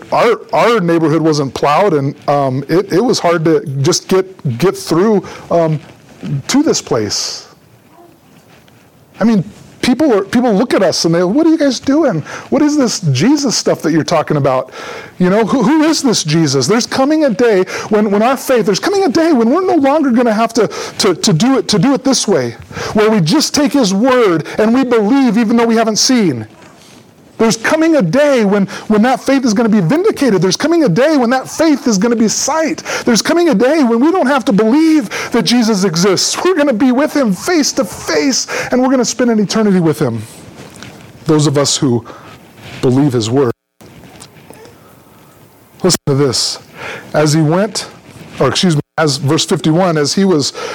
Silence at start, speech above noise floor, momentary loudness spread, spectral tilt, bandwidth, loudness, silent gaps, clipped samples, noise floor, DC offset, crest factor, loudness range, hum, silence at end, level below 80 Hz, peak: 0.1 s; 33 dB; 6 LU; -5 dB/octave; 19 kHz; -12 LUFS; none; under 0.1%; -44 dBFS; under 0.1%; 12 dB; 5 LU; none; 0 s; -50 dBFS; -2 dBFS